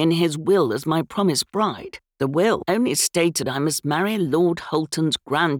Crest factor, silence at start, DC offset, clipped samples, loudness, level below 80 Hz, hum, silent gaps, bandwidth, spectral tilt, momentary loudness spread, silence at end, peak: 14 dB; 0 s; under 0.1%; under 0.1%; -21 LUFS; -60 dBFS; none; none; over 20 kHz; -4.5 dB/octave; 5 LU; 0 s; -6 dBFS